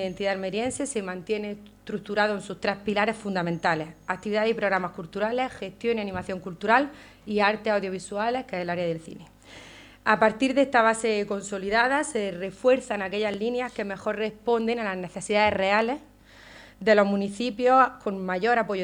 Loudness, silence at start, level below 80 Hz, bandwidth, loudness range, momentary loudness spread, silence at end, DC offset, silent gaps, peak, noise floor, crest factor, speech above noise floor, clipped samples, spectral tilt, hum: -26 LUFS; 0 s; -58 dBFS; 11 kHz; 4 LU; 11 LU; 0 s; under 0.1%; none; -6 dBFS; -50 dBFS; 20 dB; 24 dB; under 0.1%; -4.5 dB/octave; none